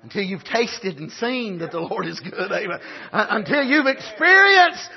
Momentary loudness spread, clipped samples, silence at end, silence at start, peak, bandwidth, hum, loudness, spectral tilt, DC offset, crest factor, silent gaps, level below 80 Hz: 16 LU; under 0.1%; 0 s; 0.05 s; -2 dBFS; 6.2 kHz; none; -19 LUFS; -4 dB/octave; under 0.1%; 18 dB; none; -68 dBFS